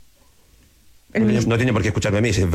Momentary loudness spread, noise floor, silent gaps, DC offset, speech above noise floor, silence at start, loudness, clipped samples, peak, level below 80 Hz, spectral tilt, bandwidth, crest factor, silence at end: 3 LU; -53 dBFS; none; under 0.1%; 35 dB; 1.15 s; -19 LUFS; under 0.1%; -8 dBFS; -42 dBFS; -6 dB/octave; 14 kHz; 12 dB; 0 s